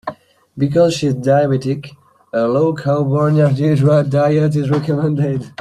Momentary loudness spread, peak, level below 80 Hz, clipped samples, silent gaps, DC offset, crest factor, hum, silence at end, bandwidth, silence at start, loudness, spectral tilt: 7 LU; -2 dBFS; -52 dBFS; under 0.1%; none; under 0.1%; 14 dB; none; 0.1 s; 11 kHz; 0.05 s; -15 LUFS; -8 dB/octave